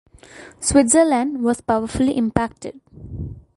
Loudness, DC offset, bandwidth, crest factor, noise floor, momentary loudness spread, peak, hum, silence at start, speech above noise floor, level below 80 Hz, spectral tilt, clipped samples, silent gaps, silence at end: -18 LUFS; under 0.1%; 11.5 kHz; 20 dB; -43 dBFS; 19 LU; 0 dBFS; none; 0.35 s; 24 dB; -40 dBFS; -4.5 dB/octave; under 0.1%; none; 0.15 s